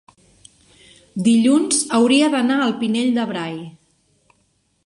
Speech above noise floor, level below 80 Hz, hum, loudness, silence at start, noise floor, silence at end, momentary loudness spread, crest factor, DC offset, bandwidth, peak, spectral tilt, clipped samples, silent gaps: 47 dB; -64 dBFS; none; -17 LUFS; 1.15 s; -64 dBFS; 1.15 s; 15 LU; 16 dB; under 0.1%; 11.5 kHz; -4 dBFS; -3.5 dB/octave; under 0.1%; none